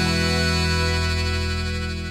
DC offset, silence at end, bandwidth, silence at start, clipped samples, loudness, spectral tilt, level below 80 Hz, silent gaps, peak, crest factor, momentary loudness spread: under 0.1%; 0 s; 14 kHz; 0 s; under 0.1%; -22 LUFS; -4.5 dB/octave; -30 dBFS; none; -8 dBFS; 14 dB; 6 LU